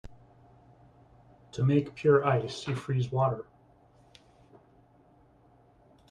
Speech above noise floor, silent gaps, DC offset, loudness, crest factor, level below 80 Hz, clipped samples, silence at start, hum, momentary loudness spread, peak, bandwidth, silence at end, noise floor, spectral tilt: 34 dB; none; under 0.1%; -28 LUFS; 20 dB; -62 dBFS; under 0.1%; 0.05 s; none; 14 LU; -12 dBFS; 9.8 kHz; 2.7 s; -61 dBFS; -7.5 dB/octave